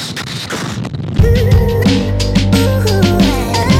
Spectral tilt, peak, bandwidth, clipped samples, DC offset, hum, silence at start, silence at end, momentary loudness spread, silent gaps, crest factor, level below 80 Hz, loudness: -6 dB/octave; 0 dBFS; 15.5 kHz; under 0.1%; under 0.1%; none; 0 s; 0 s; 10 LU; none; 10 dB; -20 dBFS; -13 LUFS